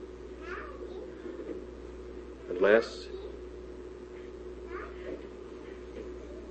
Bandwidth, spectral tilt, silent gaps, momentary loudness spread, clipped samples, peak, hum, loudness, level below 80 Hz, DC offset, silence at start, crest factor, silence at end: 8.4 kHz; -6 dB/octave; none; 18 LU; under 0.1%; -10 dBFS; 60 Hz at -50 dBFS; -36 LUFS; -52 dBFS; under 0.1%; 0 s; 26 dB; 0 s